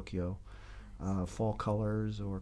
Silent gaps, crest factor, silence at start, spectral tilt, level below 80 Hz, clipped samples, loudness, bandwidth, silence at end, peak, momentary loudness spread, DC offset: none; 14 dB; 0 s; -8 dB/octave; -50 dBFS; under 0.1%; -36 LUFS; 11 kHz; 0 s; -22 dBFS; 19 LU; under 0.1%